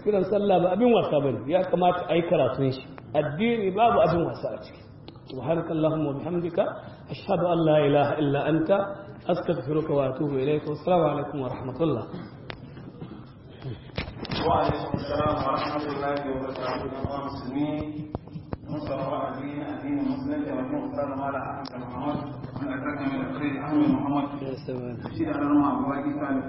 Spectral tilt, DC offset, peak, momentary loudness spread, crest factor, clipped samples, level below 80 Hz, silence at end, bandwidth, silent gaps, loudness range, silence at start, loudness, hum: -11 dB/octave; under 0.1%; -8 dBFS; 16 LU; 18 dB; under 0.1%; -52 dBFS; 0 s; 5.8 kHz; none; 7 LU; 0 s; -26 LUFS; none